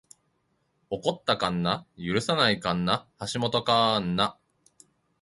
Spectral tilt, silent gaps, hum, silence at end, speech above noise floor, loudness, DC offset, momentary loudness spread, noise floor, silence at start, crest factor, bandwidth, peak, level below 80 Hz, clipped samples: -5 dB/octave; none; none; 0.9 s; 46 dB; -26 LUFS; under 0.1%; 8 LU; -72 dBFS; 0.9 s; 22 dB; 11.5 kHz; -6 dBFS; -58 dBFS; under 0.1%